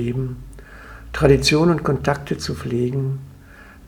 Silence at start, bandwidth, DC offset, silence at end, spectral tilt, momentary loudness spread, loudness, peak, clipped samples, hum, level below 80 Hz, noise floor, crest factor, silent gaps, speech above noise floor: 0 s; 15.5 kHz; under 0.1%; 0 s; -5.5 dB/octave; 25 LU; -20 LUFS; 0 dBFS; under 0.1%; none; -36 dBFS; -43 dBFS; 20 dB; none; 24 dB